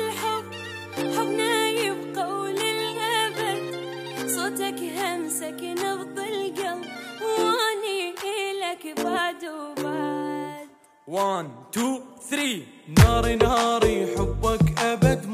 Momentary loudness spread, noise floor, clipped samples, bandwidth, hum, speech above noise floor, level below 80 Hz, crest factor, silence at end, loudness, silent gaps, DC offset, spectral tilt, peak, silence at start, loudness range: 11 LU; -46 dBFS; under 0.1%; 15.5 kHz; none; 25 dB; -38 dBFS; 22 dB; 0 s; -25 LUFS; none; under 0.1%; -4.5 dB/octave; -2 dBFS; 0 s; 7 LU